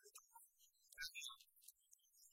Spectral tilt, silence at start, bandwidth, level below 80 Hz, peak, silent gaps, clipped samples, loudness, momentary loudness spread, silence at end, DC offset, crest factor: 3.5 dB/octave; 0 s; 16.5 kHz; -84 dBFS; -36 dBFS; none; under 0.1%; -55 LUFS; 17 LU; 0 s; under 0.1%; 24 dB